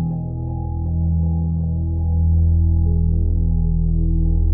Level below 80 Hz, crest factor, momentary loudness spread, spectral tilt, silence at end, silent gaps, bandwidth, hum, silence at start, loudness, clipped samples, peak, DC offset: -20 dBFS; 10 dB; 8 LU; -17.5 dB/octave; 0 s; none; 0.9 kHz; none; 0 s; -20 LUFS; under 0.1%; -8 dBFS; under 0.1%